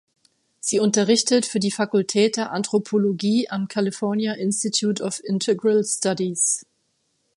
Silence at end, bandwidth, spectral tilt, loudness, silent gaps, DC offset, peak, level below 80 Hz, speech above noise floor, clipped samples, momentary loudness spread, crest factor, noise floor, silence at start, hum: 0.75 s; 11.5 kHz; -4 dB/octave; -21 LUFS; none; under 0.1%; -6 dBFS; -72 dBFS; 49 dB; under 0.1%; 6 LU; 16 dB; -70 dBFS; 0.65 s; none